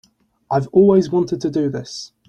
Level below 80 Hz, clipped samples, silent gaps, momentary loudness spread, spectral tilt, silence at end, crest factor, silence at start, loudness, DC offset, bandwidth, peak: -54 dBFS; under 0.1%; none; 12 LU; -7.5 dB/octave; 0.25 s; 16 dB; 0.5 s; -17 LUFS; under 0.1%; 8.8 kHz; -2 dBFS